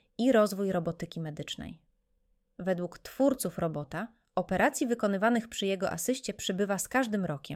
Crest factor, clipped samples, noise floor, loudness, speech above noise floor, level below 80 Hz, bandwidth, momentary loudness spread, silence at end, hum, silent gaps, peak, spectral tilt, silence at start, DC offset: 18 dB; under 0.1%; -73 dBFS; -31 LUFS; 43 dB; -62 dBFS; 17 kHz; 12 LU; 0 s; none; none; -12 dBFS; -4.5 dB/octave; 0.2 s; under 0.1%